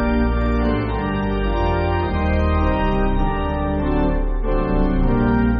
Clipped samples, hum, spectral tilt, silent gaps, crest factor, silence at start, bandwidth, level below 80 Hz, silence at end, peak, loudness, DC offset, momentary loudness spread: under 0.1%; none; -7 dB/octave; none; 12 dB; 0 s; 5 kHz; -22 dBFS; 0 s; -6 dBFS; -20 LUFS; under 0.1%; 3 LU